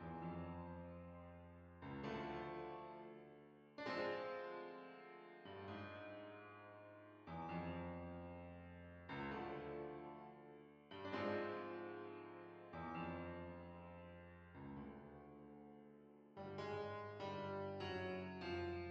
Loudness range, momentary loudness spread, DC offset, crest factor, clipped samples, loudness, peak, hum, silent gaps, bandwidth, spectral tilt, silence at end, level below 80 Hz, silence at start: 5 LU; 14 LU; under 0.1%; 18 dB; under 0.1%; -51 LUFS; -32 dBFS; none; none; 7.8 kHz; -5 dB/octave; 0 s; -72 dBFS; 0 s